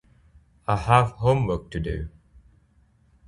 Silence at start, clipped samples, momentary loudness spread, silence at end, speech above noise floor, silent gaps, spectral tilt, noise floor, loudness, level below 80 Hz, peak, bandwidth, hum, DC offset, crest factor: 0.7 s; under 0.1%; 15 LU; 1.2 s; 38 dB; none; -7 dB/octave; -60 dBFS; -24 LUFS; -40 dBFS; -2 dBFS; 11 kHz; none; under 0.1%; 24 dB